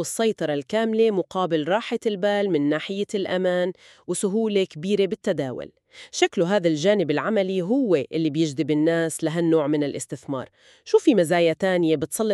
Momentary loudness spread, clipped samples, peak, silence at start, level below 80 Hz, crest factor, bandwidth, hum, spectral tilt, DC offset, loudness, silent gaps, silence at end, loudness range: 9 LU; under 0.1%; -6 dBFS; 0 s; -68 dBFS; 16 dB; 13.5 kHz; none; -5 dB/octave; under 0.1%; -23 LUFS; none; 0 s; 2 LU